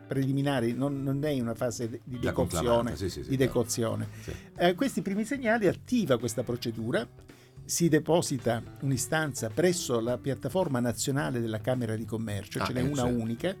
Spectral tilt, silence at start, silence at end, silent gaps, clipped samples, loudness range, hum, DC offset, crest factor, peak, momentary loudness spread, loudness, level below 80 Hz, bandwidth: -5.5 dB/octave; 0 s; 0 s; none; under 0.1%; 2 LU; none; under 0.1%; 16 dB; -12 dBFS; 7 LU; -29 LUFS; -52 dBFS; 18 kHz